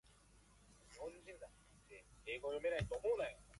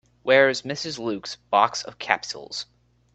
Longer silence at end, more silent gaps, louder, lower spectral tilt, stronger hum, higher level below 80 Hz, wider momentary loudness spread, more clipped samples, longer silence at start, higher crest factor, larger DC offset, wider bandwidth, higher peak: second, 0 s vs 0.5 s; neither; second, -44 LUFS vs -23 LUFS; first, -5 dB/octave vs -3 dB/octave; second, 50 Hz at -70 dBFS vs 60 Hz at -55 dBFS; about the same, -62 dBFS vs -66 dBFS; first, 21 LU vs 15 LU; neither; first, 0.7 s vs 0.25 s; about the same, 20 dB vs 24 dB; neither; first, 11.5 kHz vs 8.4 kHz; second, -26 dBFS vs 0 dBFS